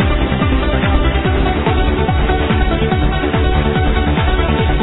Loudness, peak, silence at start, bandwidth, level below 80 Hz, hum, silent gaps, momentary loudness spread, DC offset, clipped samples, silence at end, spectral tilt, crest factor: -15 LUFS; -2 dBFS; 0 s; 4.1 kHz; -18 dBFS; none; none; 1 LU; under 0.1%; under 0.1%; 0 s; -10.5 dB/octave; 12 dB